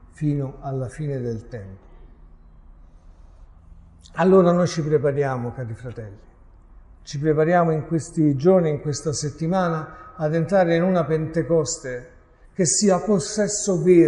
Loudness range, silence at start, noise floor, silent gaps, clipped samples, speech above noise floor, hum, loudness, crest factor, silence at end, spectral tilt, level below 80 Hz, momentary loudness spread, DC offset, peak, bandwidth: 9 LU; 0.2 s; -47 dBFS; none; under 0.1%; 27 dB; none; -21 LUFS; 18 dB; 0 s; -5.5 dB/octave; -48 dBFS; 17 LU; under 0.1%; -4 dBFS; 11 kHz